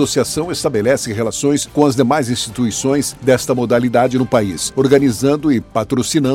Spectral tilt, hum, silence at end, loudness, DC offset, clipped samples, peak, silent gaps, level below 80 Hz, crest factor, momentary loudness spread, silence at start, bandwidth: -5 dB/octave; none; 0 s; -15 LUFS; under 0.1%; under 0.1%; 0 dBFS; none; -44 dBFS; 14 dB; 5 LU; 0 s; 16.5 kHz